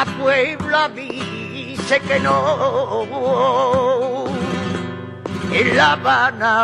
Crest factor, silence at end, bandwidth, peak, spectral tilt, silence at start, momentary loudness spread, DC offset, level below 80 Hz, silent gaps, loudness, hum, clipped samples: 16 dB; 0 s; 11.5 kHz; -2 dBFS; -5 dB/octave; 0 s; 12 LU; under 0.1%; -52 dBFS; none; -18 LUFS; none; under 0.1%